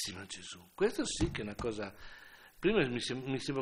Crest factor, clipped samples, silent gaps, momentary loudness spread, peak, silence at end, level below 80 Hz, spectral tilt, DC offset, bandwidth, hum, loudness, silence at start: 18 dB; under 0.1%; none; 20 LU; -18 dBFS; 0 s; -52 dBFS; -4.5 dB/octave; under 0.1%; 16 kHz; none; -35 LUFS; 0 s